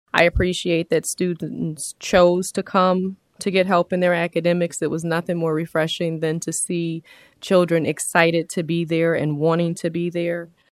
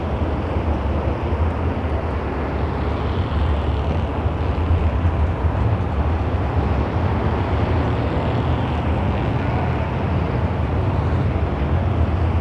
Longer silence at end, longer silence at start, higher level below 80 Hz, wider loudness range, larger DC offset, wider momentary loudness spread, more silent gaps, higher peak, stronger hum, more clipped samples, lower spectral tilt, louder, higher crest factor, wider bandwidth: first, 0.25 s vs 0 s; first, 0.15 s vs 0 s; second, -42 dBFS vs -26 dBFS; about the same, 3 LU vs 2 LU; neither; first, 9 LU vs 3 LU; neither; first, 0 dBFS vs -6 dBFS; neither; neither; second, -5 dB/octave vs -9 dB/octave; about the same, -21 LUFS vs -21 LUFS; first, 20 dB vs 12 dB; first, 15 kHz vs 6 kHz